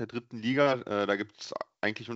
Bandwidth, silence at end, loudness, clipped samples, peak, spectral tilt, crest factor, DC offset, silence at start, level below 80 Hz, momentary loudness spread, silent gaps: 8 kHz; 0 s; -30 LUFS; under 0.1%; -12 dBFS; -3.5 dB/octave; 20 dB; under 0.1%; 0 s; -76 dBFS; 12 LU; none